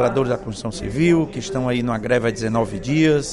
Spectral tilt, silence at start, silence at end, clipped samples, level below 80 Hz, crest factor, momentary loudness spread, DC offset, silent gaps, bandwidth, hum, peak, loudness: -6 dB/octave; 0 s; 0 s; under 0.1%; -42 dBFS; 14 dB; 8 LU; under 0.1%; none; 11.5 kHz; none; -4 dBFS; -21 LUFS